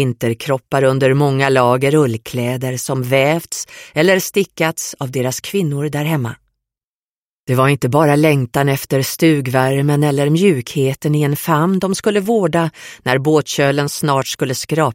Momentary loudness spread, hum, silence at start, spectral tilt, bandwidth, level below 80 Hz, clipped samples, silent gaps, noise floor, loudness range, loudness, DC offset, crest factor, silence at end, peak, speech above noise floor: 7 LU; none; 0 s; -5.5 dB/octave; 16.5 kHz; -54 dBFS; under 0.1%; 6.84-7.47 s; under -90 dBFS; 4 LU; -16 LUFS; under 0.1%; 16 dB; 0 s; 0 dBFS; over 75 dB